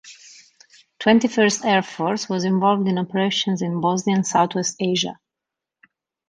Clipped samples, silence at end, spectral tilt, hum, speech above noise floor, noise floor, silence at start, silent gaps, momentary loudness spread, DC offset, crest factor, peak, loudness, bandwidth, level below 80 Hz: under 0.1%; 1.15 s; -4.5 dB/octave; none; 66 dB; -86 dBFS; 0.05 s; none; 6 LU; under 0.1%; 16 dB; -4 dBFS; -20 LUFS; 10 kHz; -64 dBFS